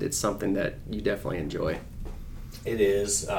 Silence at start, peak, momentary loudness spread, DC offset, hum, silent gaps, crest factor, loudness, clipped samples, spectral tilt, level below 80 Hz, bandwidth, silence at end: 0 s; -12 dBFS; 17 LU; under 0.1%; none; none; 16 dB; -29 LUFS; under 0.1%; -4 dB/octave; -42 dBFS; 19 kHz; 0 s